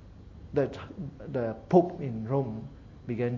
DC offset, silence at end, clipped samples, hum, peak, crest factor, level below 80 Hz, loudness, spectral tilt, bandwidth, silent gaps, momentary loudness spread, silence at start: under 0.1%; 0 s; under 0.1%; none; -8 dBFS; 22 dB; -54 dBFS; -30 LUFS; -9.5 dB/octave; 7.2 kHz; none; 22 LU; 0 s